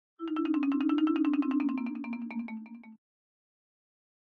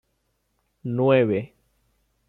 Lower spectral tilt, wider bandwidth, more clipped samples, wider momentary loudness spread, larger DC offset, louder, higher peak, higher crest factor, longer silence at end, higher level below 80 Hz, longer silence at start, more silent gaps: second, -7 dB/octave vs -10 dB/octave; first, 4.8 kHz vs 4.2 kHz; neither; second, 15 LU vs 19 LU; neither; second, -31 LUFS vs -22 LUFS; second, -18 dBFS vs -6 dBFS; second, 14 dB vs 20 dB; first, 1.35 s vs 0.8 s; second, -80 dBFS vs -66 dBFS; second, 0.2 s vs 0.85 s; neither